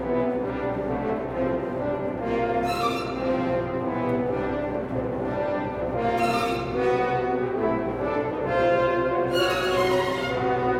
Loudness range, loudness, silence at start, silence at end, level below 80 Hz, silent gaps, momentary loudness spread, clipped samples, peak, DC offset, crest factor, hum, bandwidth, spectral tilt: 3 LU; -25 LUFS; 0 s; 0 s; -46 dBFS; none; 6 LU; under 0.1%; -10 dBFS; under 0.1%; 14 dB; none; 16.5 kHz; -6 dB/octave